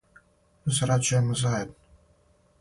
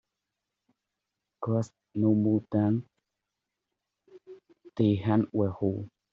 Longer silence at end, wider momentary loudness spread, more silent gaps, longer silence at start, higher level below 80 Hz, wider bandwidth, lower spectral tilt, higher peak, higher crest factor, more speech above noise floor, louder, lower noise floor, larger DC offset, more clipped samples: first, 0.9 s vs 0.25 s; about the same, 10 LU vs 12 LU; neither; second, 0.65 s vs 1.4 s; first, -54 dBFS vs -68 dBFS; first, 11.5 kHz vs 7.6 kHz; second, -4.5 dB/octave vs -9 dB/octave; about the same, -12 dBFS vs -12 dBFS; about the same, 16 dB vs 18 dB; second, 38 dB vs 59 dB; about the same, -26 LUFS vs -28 LUFS; second, -62 dBFS vs -86 dBFS; neither; neither